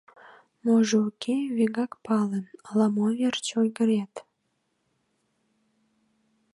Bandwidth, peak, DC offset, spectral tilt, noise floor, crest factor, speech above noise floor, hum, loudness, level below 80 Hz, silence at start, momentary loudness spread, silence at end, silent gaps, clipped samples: 11.5 kHz; -10 dBFS; under 0.1%; -5.5 dB/octave; -75 dBFS; 16 dB; 50 dB; none; -26 LUFS; -78 dBFS; 0.65 s; 9 LU; 2.35 s; none; under 0.1%